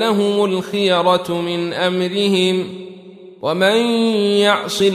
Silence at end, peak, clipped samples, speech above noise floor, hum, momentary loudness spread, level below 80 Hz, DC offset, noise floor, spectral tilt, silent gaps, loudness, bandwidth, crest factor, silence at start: 0 s; -2 dBFS; under 0.1%; 23 dB; none; 8 LU; -62 dBFS; under 0.1%; -39 dBFS; -5 dB/octave; none; -16 LUFS; 15 kHz; 14 dB; 0 s